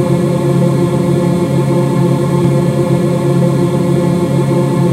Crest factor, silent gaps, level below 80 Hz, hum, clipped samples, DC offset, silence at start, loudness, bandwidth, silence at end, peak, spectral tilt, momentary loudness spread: 12 dB; none; -44 dBFS; none; under 0.1%; under 0.1%; 0 s; -12 LUFS; 13.5 kHz; 0 s; 0 dBFS; -8 dB/octave; 1 LU